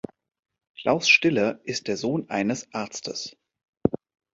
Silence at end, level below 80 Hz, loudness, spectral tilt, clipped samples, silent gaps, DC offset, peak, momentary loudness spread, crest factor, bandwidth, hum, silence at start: 0.35 s; -60 dBFS; -24 LUFS; -4 dB/octave; under 0.1%; 3.68-3.73 s; under 0.1%; -2 dBFS; 16 LU; 24 dB; 8 kHz; none; 0.8 s